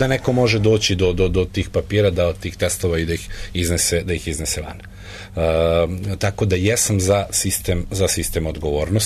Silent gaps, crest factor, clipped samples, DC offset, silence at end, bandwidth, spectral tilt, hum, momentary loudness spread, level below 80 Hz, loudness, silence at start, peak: none; 14 dB; under 0.1%; under 0.1%; 0 s; 13.5 kHz; -4.5 dB/octave; none; 8 LU; -32 dBFS; -19 LUFS; 0 s; -4 dBFS